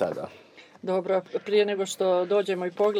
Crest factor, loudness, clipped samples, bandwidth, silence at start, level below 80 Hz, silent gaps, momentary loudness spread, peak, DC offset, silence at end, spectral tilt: 16 dB; -26 LUFS; under 0.1%; 14 kHz; 0 s; -80 dBFS; none; 11 LU; -10 dBFS; under 0.1%; 0 s; -4.5 dB/octave